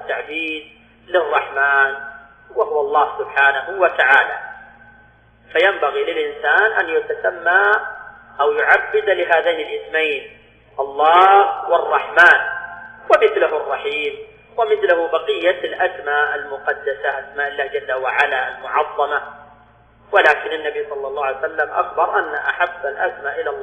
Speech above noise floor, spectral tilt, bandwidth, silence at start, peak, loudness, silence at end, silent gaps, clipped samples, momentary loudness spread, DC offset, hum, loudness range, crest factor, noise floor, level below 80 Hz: 33 dB; -3.5 dB/octave; 9.8 kHz; 0 s; 0 dBFS; -17 LUFS; 0 s; none; under 0.1%; 12 LU; under 0.1%; none; 6 LU; 18 dB; -50 dBFS; -58 dBFS